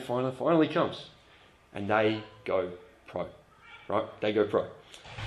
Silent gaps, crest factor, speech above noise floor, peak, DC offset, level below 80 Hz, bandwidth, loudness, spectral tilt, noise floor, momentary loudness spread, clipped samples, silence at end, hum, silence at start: none; 20 dB; 29 dB; -10 dBFS; under 0.1%; -62 dBFS; 12 kHz; -30 LUFS; -7 dB/octave; -58 dBFS; 19 LU; under 0.1%; 0 s; none; 0 s